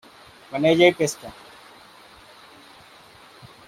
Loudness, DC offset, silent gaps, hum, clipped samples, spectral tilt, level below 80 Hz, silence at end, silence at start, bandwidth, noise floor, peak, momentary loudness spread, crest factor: -20 LUFS; under 0.1%; none; none; under 0.1%; -4.5 dB/octave; -62 dBFS; 2.35 s; 0.5 s; 15.5 kHz; -49 dBFS; -4 dBFS; 24 LU; 22 dB